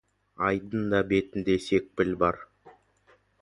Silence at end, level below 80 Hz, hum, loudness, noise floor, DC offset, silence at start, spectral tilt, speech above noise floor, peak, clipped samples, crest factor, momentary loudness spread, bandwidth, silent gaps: 0.7 s; -54 dBFS; none; -27 LUFS; -64 dBFS; under 0.1%; 0.4 s; -6.5 dB/octave; 37 dB; -10 dBFS; under 0.1%; 20 dB; 4 LU; 11.5 kHz; none